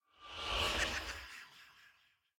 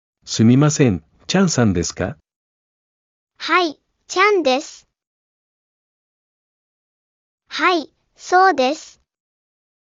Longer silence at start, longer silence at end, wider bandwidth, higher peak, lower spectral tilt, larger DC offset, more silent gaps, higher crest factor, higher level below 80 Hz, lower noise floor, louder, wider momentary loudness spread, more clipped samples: about the same, 0.2 s vs 0.25 s; second, 0.5 s vs 1 s; first, 17.5 kHz vs 7.6 kHz; second, -22 dBFS vs 0 dBFS; second, -2 dB/octave vs -5 dB/octave; neither; second, none vs 2.36-3.27 s, 5.07-7.38 s; about the same, 20 dB vs 20 dB; about the same, -54 dBFS vs -54 dBFS; second, -72 dBFS vs under -90 dBFS; second, -37 LUFS vs -17 LUFS; first, 20 LU vs 14 LU; neither